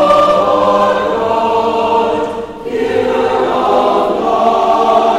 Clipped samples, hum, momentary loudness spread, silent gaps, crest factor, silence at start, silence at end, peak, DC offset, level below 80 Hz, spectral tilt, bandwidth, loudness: under 0.1%; none; 6 LU; none; 12 dB; 0 s; 0 s; 0 dBFS; under 0.1%; -42 dBFS; -5 dB/octave; 14.5 kHz; -12 LUFS